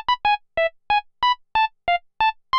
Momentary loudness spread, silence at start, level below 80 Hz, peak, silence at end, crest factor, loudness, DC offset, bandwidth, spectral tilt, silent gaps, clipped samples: 4 LU; 0.1 s; -50 dBFS; -10 dBFS; 0 s; 12 dB; -22 LUFS; under 0.1%; 6.2 kHz; -2.5 dB/octave; none; under 0.1%